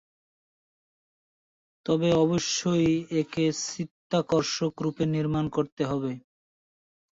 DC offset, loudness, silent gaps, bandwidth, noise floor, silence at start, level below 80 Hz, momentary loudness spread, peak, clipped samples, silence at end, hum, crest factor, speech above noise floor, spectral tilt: under 0.1%; -27 LUFS; 3.91-4.10 s, 5.72-5.77 s; 8 kHz; under -90 dBFS; 1.85 s; -58 dBFS; 8 LU; -12 dBFS; under 0.1%; 0.9 s; none; 16 dB; over 64 dB; -5.5 dB/octave